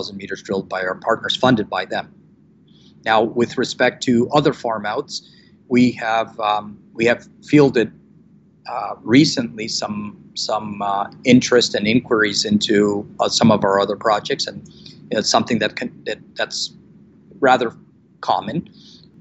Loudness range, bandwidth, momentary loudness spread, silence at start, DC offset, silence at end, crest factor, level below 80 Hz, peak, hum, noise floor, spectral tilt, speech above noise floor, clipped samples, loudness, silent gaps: 5 LU; 8.4 kHz; 13 LU; 0 s; under 0.1%; 0.55 s; 18 dB; -56 dBFS; 0 dBFS; none; -51 dBFS; -4.5 dB/octave; 32 dB; under 0.1%; -19 LUFS; none